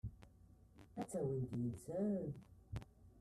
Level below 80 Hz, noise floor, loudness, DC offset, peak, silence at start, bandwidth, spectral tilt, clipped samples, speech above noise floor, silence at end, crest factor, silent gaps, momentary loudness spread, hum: -62 dBFS; -65 dBFS; -45 LUFS; under 0.1%; -30 dBFS; 0.05 s; 13.5 kHz; -8.5 dB/octave; under 0.1%; 23 dB; 0 s; 14 dB; none; 23 LU; none